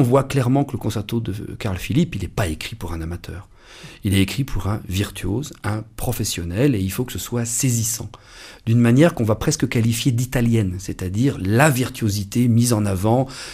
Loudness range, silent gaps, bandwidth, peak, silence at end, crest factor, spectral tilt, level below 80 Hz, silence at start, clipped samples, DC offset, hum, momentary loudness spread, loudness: 6 LU; none; 15.5 kHz; 0 dBFS; 0 s; 20 dB; -5.5 dB/octave; -38 dBFS; 0 s; under 0.1%; under 0.1%; none; 12 LU; -21 LUFS